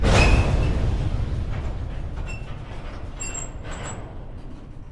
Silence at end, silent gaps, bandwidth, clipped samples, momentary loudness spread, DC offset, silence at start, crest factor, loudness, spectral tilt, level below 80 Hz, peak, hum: 0 s; none; 11.5 kHz; under 0.1%; 20 LU; under 0.1%; 0 s; 20 dB; -26 LUFS; -5 dB/octave; -26 dBFS; -4 dBFS; none